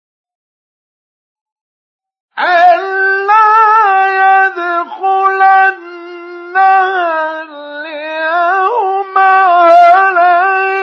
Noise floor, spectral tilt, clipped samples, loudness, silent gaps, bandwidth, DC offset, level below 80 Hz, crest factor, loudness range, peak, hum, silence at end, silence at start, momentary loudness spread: under -90 dBFS; -2 dB/octave; under 0.1%; -9 LUFS; none; 6.4 kHz; under 0.1%; -76 dBFS; 10 dB; 4 LU; 0 dBFS; none; 0 s; 2.35 s; 18 LU